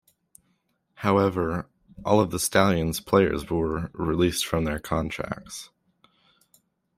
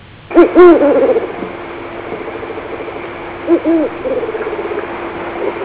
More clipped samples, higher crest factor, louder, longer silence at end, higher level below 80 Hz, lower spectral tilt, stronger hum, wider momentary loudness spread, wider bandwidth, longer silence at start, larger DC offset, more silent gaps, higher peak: neither; first, 22 dB vs 14 dB; second, -25 LUFS vs -12 LUFS; first, 1.3 s vs 0 s; about the same, -48 dBFS vs -44 dBFS; second, -5 dB/octave vs -10.5 dB/octave; neither; second, 12 LU vs 19 LU; first, 16 kHz vs 4 kHz; first, 1 s vs 0 s; neither; neither; second, -4 dBFS vs 0 dBFS